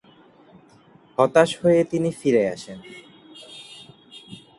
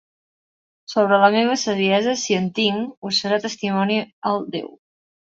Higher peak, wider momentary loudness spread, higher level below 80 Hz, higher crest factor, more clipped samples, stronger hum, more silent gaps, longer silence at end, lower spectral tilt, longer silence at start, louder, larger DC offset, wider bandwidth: about the same, -2 dBFS vs -2 dBFS; first, 26 LU vs 10 LU; about the same, -62 dBFS vs -66 dBFS; about the same, 22 dB vs 18 dB; neither; neither; second, none vs 2.97-3.02 s, 4.13-4.22 s; second, 0.2 s vs 0.65 s; first, -6 dB/octave vs -4 dB/octave; first, 1.2 s vs 0.9 s; about the same, -20 LUFS vs -20 LUFS; neither; first, 11.5 kHz vs 8 kHz